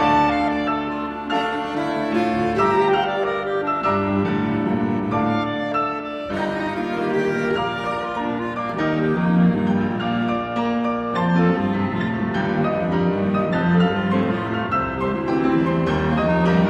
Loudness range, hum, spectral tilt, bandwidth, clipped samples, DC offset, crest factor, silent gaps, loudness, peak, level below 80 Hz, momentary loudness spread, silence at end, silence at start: 2 LU; none; -8 dB/octave; 8.4 kHz; under 0.1%; under 0.1%; 14 dB; none; -21 LUFS; -6 dBFS; -44 dBFS; 6 LU; 0 s; 0 s